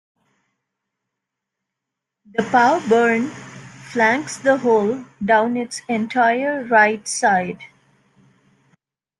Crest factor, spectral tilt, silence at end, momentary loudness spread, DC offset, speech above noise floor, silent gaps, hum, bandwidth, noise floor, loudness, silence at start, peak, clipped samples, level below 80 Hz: 18 dB; -4 dB/octave; 1.55 s; 13 LU; under 0.1%; 65 dB; none; none; 12 kHz; -82 dBFS; -18 LUFS; 2.35 s; -2 dBFS; under 0.1%; -66 dBFS